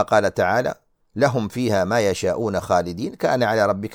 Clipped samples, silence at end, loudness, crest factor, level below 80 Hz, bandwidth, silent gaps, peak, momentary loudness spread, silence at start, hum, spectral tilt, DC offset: under 0.1%; 0 s; -21 LUFS; 18 dB; -52 dBFS; 18.5 kHz; none; -4 dBFS; 8 LU; 0 s; none; -5.5 dB/octave; under 0.1%